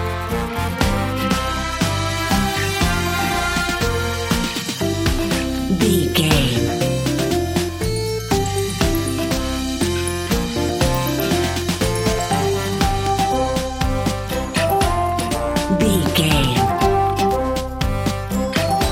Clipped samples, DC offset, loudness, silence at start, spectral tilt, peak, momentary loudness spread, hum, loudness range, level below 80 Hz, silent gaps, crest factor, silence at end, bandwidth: under 0.1%; under 0.1%; -19 LUFS; 0 s; -4.5 dB/octave; 0 dBFS; 5 LU; none; 2 LU; -30 dBFS; none; 18 dB; 0 s; 16.5 kHz